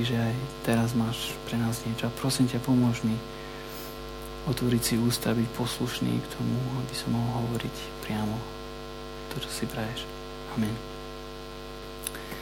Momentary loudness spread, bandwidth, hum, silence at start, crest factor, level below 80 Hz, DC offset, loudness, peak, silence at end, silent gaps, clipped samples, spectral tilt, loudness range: 14 LU; 17 kHz; none; 0 s; 18 dB; -48 dBFS; under 0.1%; -30 LUFS; -12 dBFS; 0 s; none; under 0.1%; -5.5 dB/octave; 7 LU